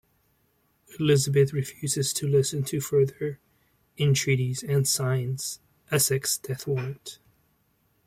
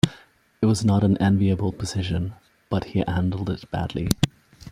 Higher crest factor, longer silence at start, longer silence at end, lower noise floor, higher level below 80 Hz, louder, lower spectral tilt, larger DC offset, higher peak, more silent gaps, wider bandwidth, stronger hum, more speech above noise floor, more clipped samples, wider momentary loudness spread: about the same, 18 dB vs 22 dB; first, 0.9 s vs 0.05 s; first, 0.9 s vs 0 s; first, -69 dBFS vs -52 dBFS; second, -62 dBFS vs -46 dBFS; about the same, -26 LUFS vs -24 LUFS; second, -4.5 dB/octave vs -6.5 dB/octave; neither; second, -10 dBFS vs -2 dBFS; neither; about the same, 16 kHz vs 15.5 kHz; neither; first, 43 dB vs 30 dB; neither; about the same, 11 LU vs 9 LU